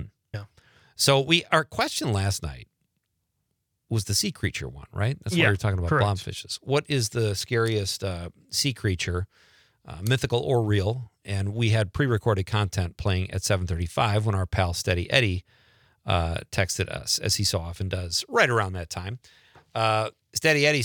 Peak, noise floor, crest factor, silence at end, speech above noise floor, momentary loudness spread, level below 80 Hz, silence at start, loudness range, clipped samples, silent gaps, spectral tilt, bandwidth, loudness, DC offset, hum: -2 dBFS; -77 dBFS; 24 dB; 0 s; 52 dB; 12 LU; -50 dBFS; 0 s; 2 LU; under 0.1%; none; -4.5 dB/octave; 19.5 kHz; -25 LUFS; under 0.1%; none